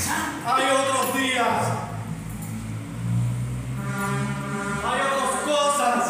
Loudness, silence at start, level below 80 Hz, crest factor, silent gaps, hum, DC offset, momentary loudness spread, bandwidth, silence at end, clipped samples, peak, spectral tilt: -24 LUFS; 0 s; -48 dBFS; 14 dB; none; none; under 0.1%; 12 LU; 16 kHz; 0 s; under 0.1%; -10 dBFS; -4 dB/octave